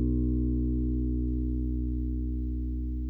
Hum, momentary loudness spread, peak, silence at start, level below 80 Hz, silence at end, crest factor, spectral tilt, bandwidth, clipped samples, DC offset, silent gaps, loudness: 60 Hz at -65 dBFS; 5 LU; -18 dBFS; 0 s; -30 dBFS; 0 s; 12 dB; -13.5 dB/octave; 1.1 kHz; under 0.1%; under 0.1%; none; -31 LUFS